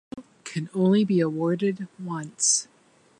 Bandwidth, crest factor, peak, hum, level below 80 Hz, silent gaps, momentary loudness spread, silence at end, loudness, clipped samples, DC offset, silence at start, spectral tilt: 11.5 kHz; 18 dB; -8 dBFS; none; -72 dBFS; none; 14 LU; 0.55 s; -24 LUFS; under 0.1%; under 0.1%; 0.15 s; -4.5 dB/octave